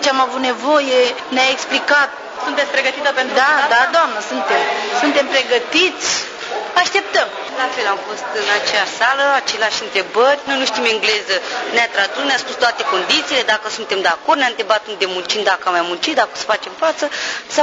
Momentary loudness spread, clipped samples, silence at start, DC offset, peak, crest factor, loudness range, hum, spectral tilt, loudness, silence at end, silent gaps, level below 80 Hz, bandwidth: 7 LU; under 0.1%; 0 s; under 0.1%; -2 dBFS; 16 dB; 2 LU; none; -1 dB/octave; -16 LUFS; 0 s; none; -64 dBFS; 10 kHz